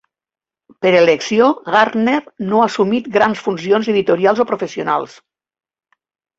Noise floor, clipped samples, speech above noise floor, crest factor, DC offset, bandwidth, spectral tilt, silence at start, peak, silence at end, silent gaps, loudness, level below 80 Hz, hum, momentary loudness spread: under -90 dBFS; under 0.1%; over 75 dB; 16 dB; under 0.1%; 7.8 kHz; -5.5 dB/octave; 0.8 s; -2 dBFS; 1.25 s; none; -15 LUFS; -60 dBFS; none; 7 LU